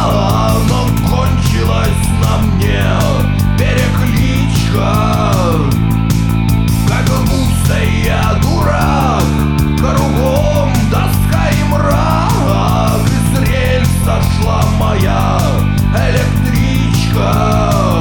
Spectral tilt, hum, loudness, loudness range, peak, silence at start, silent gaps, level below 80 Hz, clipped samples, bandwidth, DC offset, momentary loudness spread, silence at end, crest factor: -6 dB/octave; none; -12 LUFS; 0 LU; 0 dBFS; 0 s; none; -18 dBFS; under 0.1%; 19 kHz; 0.6%; 1 LU; 0 s; 10 dB